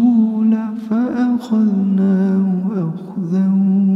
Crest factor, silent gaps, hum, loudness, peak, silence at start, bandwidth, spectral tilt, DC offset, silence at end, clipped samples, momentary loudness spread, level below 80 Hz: 10 dB; none; none; -16 LUFS; -4 dBFS; 0 s; 5.8 kHz; -10 dB/octave; under 0.1%; 0 s; under 0.1%; 6 LU; -66 dBFS